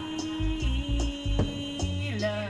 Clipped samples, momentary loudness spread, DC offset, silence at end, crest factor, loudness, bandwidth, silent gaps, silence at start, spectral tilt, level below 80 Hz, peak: under 0.1%; 2 LU; under 0.1%; 0 s; 16 dB; -30 LUFS; 10.5 kHz; none; 0 s; -5.5 dB/octave; -32 dBFS; -14 dBFS